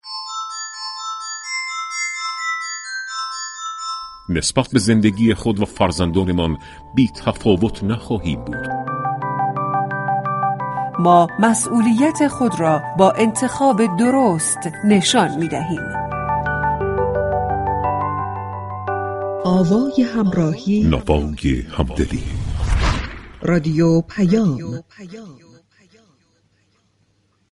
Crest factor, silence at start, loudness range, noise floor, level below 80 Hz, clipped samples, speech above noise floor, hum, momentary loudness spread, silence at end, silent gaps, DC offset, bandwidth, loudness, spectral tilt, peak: 18 dB; 0.05 s; 6 LU; -62 dBFS; -34 dBFS; under 0.1%; 45 dB; none; 11 LU; 2.15 s; none; under 0.1%; 11.5 kHz; -19 LUFS; -5.5 dB/octave; 0 dBFS